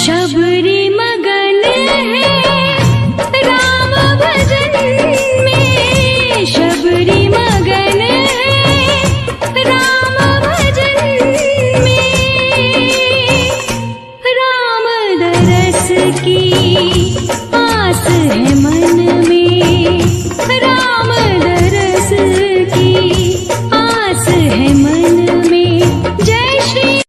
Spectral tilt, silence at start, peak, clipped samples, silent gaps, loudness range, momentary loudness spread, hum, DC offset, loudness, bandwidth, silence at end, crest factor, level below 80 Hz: -4.5 dB/octave; 0 s; 0 dBFS; under 0.1%; none; 1 LU; 4 LU; none; under 0.1%; -10 LUFS; 14.5 kHz; 0.05 s; 10 dB; -30 dBFS